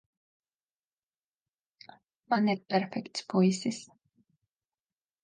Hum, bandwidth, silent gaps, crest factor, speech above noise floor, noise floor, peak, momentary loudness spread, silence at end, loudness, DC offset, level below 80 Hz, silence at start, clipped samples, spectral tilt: none; 9.6 kHz; none; 20 dB; over 61 dB; under -90 dBFS; -14 dBFS; 10 LU; 1.4 s; -30 LUFS; under 0.1%; -82 dBFS; 2.3 s; under 0.1%; -5.5 dB/octave